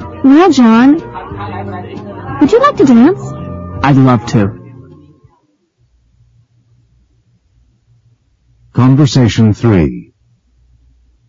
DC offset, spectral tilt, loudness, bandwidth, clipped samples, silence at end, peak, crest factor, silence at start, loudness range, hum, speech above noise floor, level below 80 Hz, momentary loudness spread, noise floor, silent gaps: under 0.1%; -7.5 dB/octave; -9 LUFS; 7.6 kHz; under 0.1%; 1.25 s; 0 dBFS; 12 dB; 0 s; 8 LU; none; 49 dB; -38 dBFS; 18 LU; -56 dBFS; none